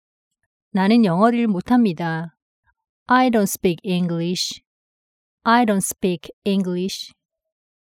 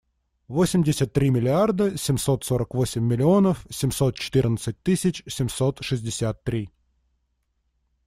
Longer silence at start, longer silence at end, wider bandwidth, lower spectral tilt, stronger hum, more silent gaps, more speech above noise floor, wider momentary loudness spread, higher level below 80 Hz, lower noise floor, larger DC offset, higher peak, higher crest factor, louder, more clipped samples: first, 0.75 s vs 0.5 s; second, 0.85 s vs 1.4 s; about the same, 17 kHz vs 15.5 kHz; about the same, -5 dB/octave vs -6 dB/octave; neither; first, 2.42-2.63 s, 2.89-3.06 s, 4.67-5.38 s, 6.33-6.42 s vs none; first, over 71 dB vs 50 dB; first, 11 LU vs 8 LU; second, -60 dBFS vs -48 dBFS; first, under -90 dBFS vs -72 dBFS; neither; first, -4 dBFS vs -8 dBFS; about the same, 18 dB vs 16 dB; first, -20 LUFS vs -23 LUFS; neither